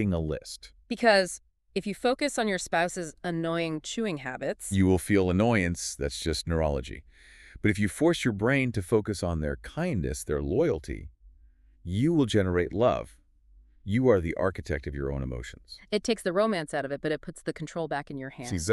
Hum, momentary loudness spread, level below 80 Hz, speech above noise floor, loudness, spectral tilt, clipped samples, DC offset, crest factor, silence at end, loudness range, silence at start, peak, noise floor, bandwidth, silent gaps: none; 13 LU; -44 dBFS; 30 dB; -28 LUFS; -5.5 dB/octave; under 0.1%; under 0.1%; 18 dB; 0 s; 3 LU; 0 s; -10 dBFS; -58 dBFS; 13.5 kHz; none